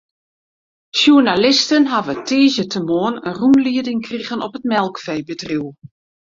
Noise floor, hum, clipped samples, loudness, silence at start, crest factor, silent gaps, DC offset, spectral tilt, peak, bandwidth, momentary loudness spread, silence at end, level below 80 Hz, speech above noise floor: under -90 dBFS; none; under 0.1%; -16 LUFS; 0.95 s; 16 dB; none; under 0.1%; -4 dB/octave; 0 dBFS; 7.6 kHz; 13 LU; 0.6 s; -58 dBFS; over 74 dB